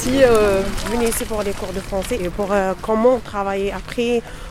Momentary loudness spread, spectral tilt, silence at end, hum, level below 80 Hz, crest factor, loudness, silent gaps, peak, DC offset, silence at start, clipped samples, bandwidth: 10 LU; -4.5 dB/octave; 0 s; none; -32 dBFS; 16 dB; -19 LUFS; none; -2 dBFS; under 0.1%; 0 s; under 0.1%; 16.5 kHz